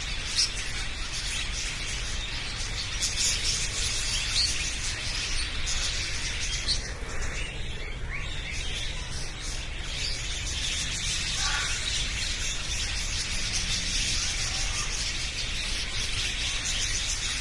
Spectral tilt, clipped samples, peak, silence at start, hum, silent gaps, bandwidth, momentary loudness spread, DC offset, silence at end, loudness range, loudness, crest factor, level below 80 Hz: -1 dB/octave; under 0.1%; -12 dBFS; 0 s; none; none; 11.5 kHz; 8 LU; under 0.1%; 0 s; 5 LU; -28 LUFS; 18 dB; -36 dBFS